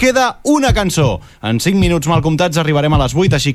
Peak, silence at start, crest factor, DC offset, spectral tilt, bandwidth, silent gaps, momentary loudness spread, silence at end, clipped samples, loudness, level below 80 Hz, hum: -2 dBFS; 0 s; 10 dB; under 0.1%; -5.5 dB/octave; 15.5 kHz; none; 4 LU; 0 s; under 0.1%; -14 LUFS; -28 dBFS; none